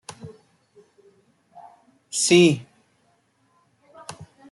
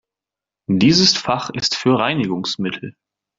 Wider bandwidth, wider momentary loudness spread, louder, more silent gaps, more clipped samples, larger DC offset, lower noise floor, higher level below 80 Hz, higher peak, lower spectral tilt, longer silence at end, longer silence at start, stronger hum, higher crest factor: first, 12 kHz vs 7.8 kHz; first, 28 LU vs 16 LU; about the same, -19 LUFS vs -17 LUFS; neither; neither; neither; second, -65 dBFS vs -88 dBFS; second, -68 dBFS vs -54 dBFS; about the same, -4 dBFS vs -2 dBFS; about the same, -4 dB/octave vs -4 dB/octave; second, 0.25 s vs 0.45 s; second, 0.25 s vs 0.7 s; neither; about the same, 22 dB vs 18 dB